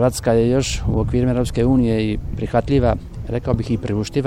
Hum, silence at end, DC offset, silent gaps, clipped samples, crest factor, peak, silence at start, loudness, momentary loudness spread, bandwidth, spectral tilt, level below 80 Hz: none; 0 s; under 0.1%; none; under 0.1%; 16 dB; -2 dBFS; 0 s; -19 LUFS; 7 LU; 15 kHz; -6.5 dB/octave; -30 dBFS